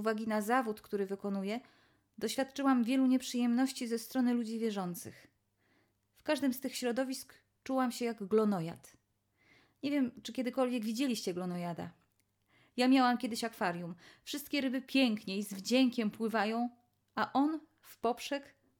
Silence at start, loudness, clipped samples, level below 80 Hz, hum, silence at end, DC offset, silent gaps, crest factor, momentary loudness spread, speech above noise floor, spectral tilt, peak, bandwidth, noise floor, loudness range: 0 s; -34 LUFS; under 0.1%; -78 dBFS; none; 0.35 s; under 0.1%; none; 18 dB; 13 LU; 42 dB; -4.5 dB/octave; -16 dBFS; 18 kHz; -76 dBFS; 4 LU